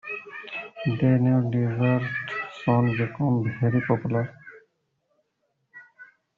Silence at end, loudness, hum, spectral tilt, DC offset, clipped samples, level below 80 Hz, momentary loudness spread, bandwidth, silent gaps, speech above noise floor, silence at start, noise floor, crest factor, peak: 0.35 s; -25 LUFS; none; -7.5 dB/octave; under 0.1%; under 0.1%; -62 dBFS; 13 LU; 4.8 kHz; none; 52 dB; 0.05 s; -75 dBFS; 16 dB; -8 dBFS